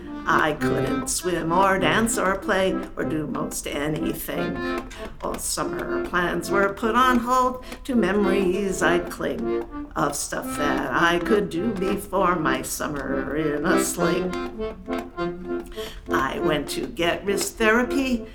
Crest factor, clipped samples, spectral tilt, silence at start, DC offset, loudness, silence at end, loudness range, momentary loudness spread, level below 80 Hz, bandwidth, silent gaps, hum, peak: 20 dB; under 0.1%; -4 dB/octave; 0 s; under 0.1%; -23 LUFS; 0 s; 5 LU; 10 LU; -42 dBFS; over 20 kHz; none; none; -4 dBFS